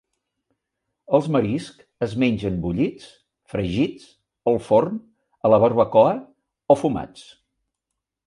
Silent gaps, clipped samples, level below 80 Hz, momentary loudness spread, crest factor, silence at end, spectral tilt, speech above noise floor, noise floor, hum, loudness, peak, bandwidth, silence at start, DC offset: none; under 0.1%; -50 dBFS; 13 LU; 20 dB; 1.05 s; -7.5 dB/octave; 62 dB; -83 dBFS; none; -21 LUFS; -2 dBFS; 11 kHz; 1.1 s; under 0.1%